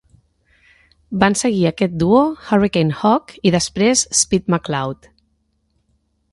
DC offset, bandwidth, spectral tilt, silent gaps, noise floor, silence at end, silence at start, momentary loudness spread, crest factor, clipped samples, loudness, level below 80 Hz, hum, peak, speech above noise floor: under 0.1%; 11.5 kHz; -4.5 dB/octave; none; -65 dBFS; 1.4 s; 1.1 s; 8 LU; 18 dB; under 0.1%; -17 LUFS; -48 dBFS; none; 0 dBFS; 49 dB